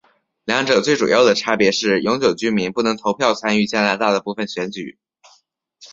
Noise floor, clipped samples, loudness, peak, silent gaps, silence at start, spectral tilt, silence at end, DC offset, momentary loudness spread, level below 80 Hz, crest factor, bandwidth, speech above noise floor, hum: -59 dBFS; under 0.1%; -18 LUFS; 0 dBFS; none; 0.45 s; -4 dB/octave; 0.05 s; under 0.1%; 11 LU; -58 dBFS; 18 dB; 7.8 kHz; 41 dB; none